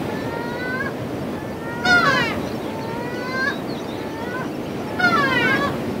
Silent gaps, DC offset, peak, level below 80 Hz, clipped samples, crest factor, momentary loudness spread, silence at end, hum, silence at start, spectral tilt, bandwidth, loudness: none; under 0.1%; -4 dBFS; -50 dBFS; under 0.1%; 18 dB; 12 LU; 0 s; none; 0 s; -5 dB/octave; 16 kHz; -22 LUFS